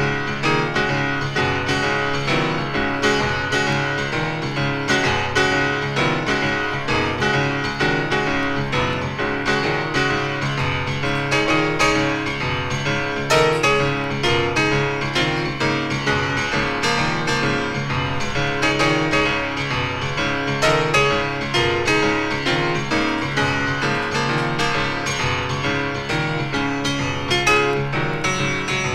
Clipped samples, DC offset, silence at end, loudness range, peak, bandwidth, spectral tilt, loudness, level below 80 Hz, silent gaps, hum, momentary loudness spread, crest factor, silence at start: under 0.1%; under 0.1%; 0 s; 2 LU; -4 dBFS; 14 kHz; -4.5 dB/octave; -20 LUFS; -40 dBFS; none; none; 5 LU; 16 dB; 0 s